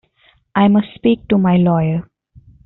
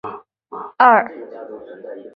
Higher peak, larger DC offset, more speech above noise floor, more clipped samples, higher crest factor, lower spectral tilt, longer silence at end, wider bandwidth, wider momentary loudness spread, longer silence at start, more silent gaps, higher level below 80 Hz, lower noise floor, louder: about the same, 0 dBFS vs -2 dBFS; neither; first, 42 dB vs 18 dB; neither; about the same, 16 dB vs 18 dB; about the same, -7 dB/octave vs -7.5 dB/octave; first, 0.65 s vs 0.15 s; second, 4.1 kHz vs 5.6 kHz; second, 8 LU vs 23 LU; first, 0.55 s vs 0.05 s; neither; first, -48 dBFS vs -68 dBFS; first, -56 dBFS vs -35 dBFS; about the same, -15 LUFS vs -14 LUFS